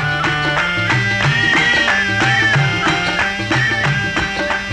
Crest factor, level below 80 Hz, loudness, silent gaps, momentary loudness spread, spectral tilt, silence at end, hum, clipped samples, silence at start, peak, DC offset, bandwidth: 12 dB; -38 dBFS; -14 LUFS; none; 5 LU; -4 dB/octave; 0 s; none; under 0.1%; 0 s; -4 dBFS; under 0.1%; 11.5 kHz